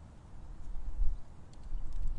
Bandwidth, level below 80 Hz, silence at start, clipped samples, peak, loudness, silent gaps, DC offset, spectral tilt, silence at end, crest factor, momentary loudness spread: 1.8 kHz; -36 dBFS; 0 s; under 0.1%; -16 dBFS; -46 LUFS; none; under 0.1%; -7 dB/octave; 0 s; 16 dB; 13 LU